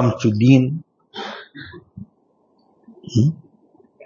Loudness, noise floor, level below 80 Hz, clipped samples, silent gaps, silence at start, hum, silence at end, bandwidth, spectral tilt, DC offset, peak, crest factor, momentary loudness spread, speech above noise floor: -18 LUFS; -61 dBFS; -56 dBFS; under 0.1%; none; 0 s; none; 0 s; 7.2 kHz; -7.5 dB/octave; under 0.1%; 0 dBFS; 20 dB; 25 LU; 45 dB